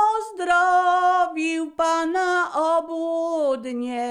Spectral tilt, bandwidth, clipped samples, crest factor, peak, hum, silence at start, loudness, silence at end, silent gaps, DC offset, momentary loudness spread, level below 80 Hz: -2.5 dB/octave; 11 kHz; under 0.1%; 12 dB; -8 dBFS; none; 0 s; -22 LUFS; 0 s; none; under 0.1%; 8 LU; -62 dBFS